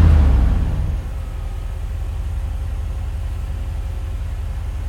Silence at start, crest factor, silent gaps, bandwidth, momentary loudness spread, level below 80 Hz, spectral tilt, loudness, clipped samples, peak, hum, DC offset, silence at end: 0 s; 16 dB; none; 11 kHz; 12 LU; -20 dBFS; -8 dB/octave; -23 LUFS; under 0.1%; -2 dBFS; none; under 0.1%; 0 s